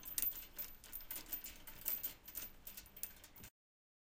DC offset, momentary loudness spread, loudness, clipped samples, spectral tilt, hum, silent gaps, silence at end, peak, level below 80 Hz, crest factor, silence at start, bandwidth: under 0.1%; 15 LU; -45 LUFS; under 0.1%; -1 dB/octave; none; none; 0.7 s; -16 dBFS; -64 dBFS; 34 dB; 0 s; 17 kHz